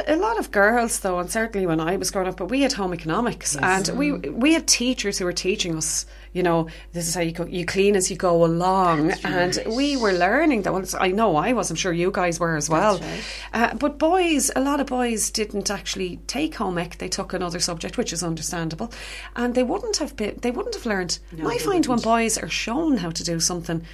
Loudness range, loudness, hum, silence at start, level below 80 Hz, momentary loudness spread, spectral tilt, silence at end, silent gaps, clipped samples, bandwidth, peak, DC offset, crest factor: 5 LU; -22 LUFS; none; 0 s; -42 dBFS; 8 LU; -3.5 dB/octave; 0 s; none; under 0.1%; 15.5 kHz; -2 dBFS; under 0.1%; 20 dB